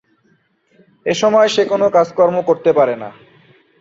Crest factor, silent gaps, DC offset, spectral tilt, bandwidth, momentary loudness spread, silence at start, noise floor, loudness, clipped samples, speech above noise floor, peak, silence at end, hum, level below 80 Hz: 14 dB; none; under 0.1%; -4.5 dB/octave; 7.8 kHz; 12 LU; 1.05 s; -59 dBFS; -14 LUFS; under 0.1%; 45 dB; -2 dBFS; 0.7 s; none; -62 dBFS